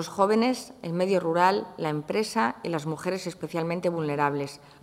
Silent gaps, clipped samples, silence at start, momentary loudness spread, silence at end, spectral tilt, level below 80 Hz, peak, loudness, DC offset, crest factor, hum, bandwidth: none; under 0.1%; 0 s; 10 LU; 0.25 s; -5.5 dB/octave; -68 dBFS; -8 dBFS; -27 LUFS; under 0.1%; 20 dB; none; 16 kHz